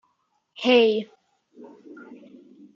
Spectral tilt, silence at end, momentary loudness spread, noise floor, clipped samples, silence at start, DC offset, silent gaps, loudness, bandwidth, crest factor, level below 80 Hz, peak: -5 dB/octave; 0.6 s; 27 LU; -71 dBFS; under 0.1%; 0.6 s; under 0.1%; none; -21 LUFS; 7.2 kHz; 20 dB; -82 dBFS; -6 dBFS